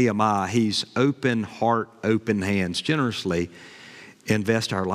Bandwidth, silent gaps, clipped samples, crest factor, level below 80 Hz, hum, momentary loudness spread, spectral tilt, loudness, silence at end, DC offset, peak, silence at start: 15 kHz; none; under 0.1%; 16 dB; -64 dBFS; none; 14 LU; -5.5 dB/octave; -24 LUFS; 0 s; under 0.1%; -6 dBFS; 0 s